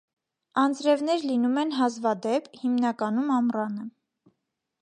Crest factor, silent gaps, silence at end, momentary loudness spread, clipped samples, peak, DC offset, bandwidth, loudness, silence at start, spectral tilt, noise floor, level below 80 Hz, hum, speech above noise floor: 16 dB; none; 0.95 s; 7 LU; under 0.1%; -10 dBFS; under 0.1%; 10 kHz; -26 LUFS; 0.55 s; -5 dB/octave; -80 dBFS; -80 dBFS; none; 55 dB